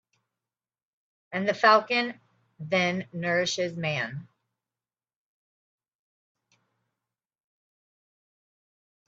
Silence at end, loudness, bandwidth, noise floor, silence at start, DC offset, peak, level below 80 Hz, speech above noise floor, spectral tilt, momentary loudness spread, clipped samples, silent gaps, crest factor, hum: 4.85 s; -26 LUFS; 7.8 kHz; under -90 dBFS; 1.3 s; under 0.1%; -4 dBFS; -76 dBFS; over 64 dB; -4.5 dB/octave; 15 LU; under 0.1%; none; 26 dB; none